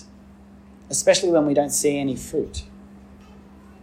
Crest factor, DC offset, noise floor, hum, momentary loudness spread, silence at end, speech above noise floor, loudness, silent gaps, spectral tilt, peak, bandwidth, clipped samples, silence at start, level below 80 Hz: 20 dB; under 0.1%; -47 dBFS; none; 10 LU; 0.1 s; 26 dB; -21 LUFS; none; -3.5 dB/octave; -4 dBFS; 16 kHz; under 0.1%; 0 s; -48 dBFS